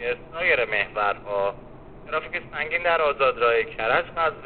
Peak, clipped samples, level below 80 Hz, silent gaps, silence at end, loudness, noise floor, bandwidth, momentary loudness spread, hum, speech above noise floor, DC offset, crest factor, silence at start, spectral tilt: -6 dBFS; under 0.1%; -50 dBFS; none; 0 s; -23 LUFS; -43 dBFS; 4.6 kHz; 9 LU; none; 20 dB; 0.3%; 18 dB; 0 s; -0.5 dB/octave